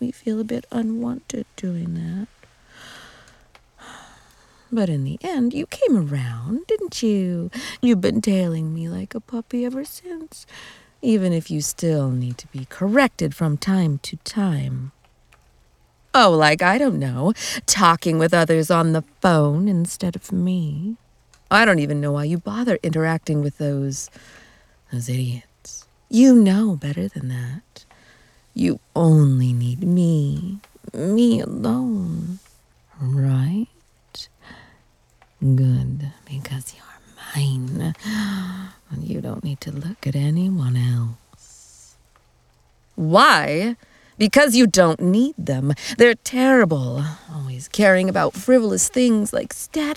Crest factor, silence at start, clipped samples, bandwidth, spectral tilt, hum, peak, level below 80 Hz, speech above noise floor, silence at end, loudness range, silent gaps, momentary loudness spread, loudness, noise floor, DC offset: 20 dB; 0 s; under 0.1%; 16 kHz; -5.5 dB/octave; none; 0 dBFS; -52 dBFS; 38 dB; 0 s; 10 LU; none; 17 LU; -20 LUFS; -58 dBFS; under 0.1%